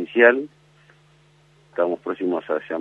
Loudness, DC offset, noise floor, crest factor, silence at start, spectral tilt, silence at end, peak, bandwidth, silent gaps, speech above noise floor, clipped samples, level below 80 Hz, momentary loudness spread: -21 LUFS; under 0.1%; -56 dBFS; 22 dB; 0 s; -6.5 dB/octave; 0 s; -2 dBFS; 4.2 kHz; none; 35 dB; under 0.1%; -72 dBFS; 15 LU